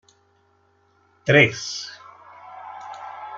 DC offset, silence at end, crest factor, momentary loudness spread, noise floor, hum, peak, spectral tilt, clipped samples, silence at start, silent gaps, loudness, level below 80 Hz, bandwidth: under 0.1%; 0 s; 24 dB; 25 LU; -62 dBFS; none; -2 dBFS; -4.5 dB/octave; under 0.1%; 1.25 s; none; -19 LUFS; -62 dBFS; 7.8 kHz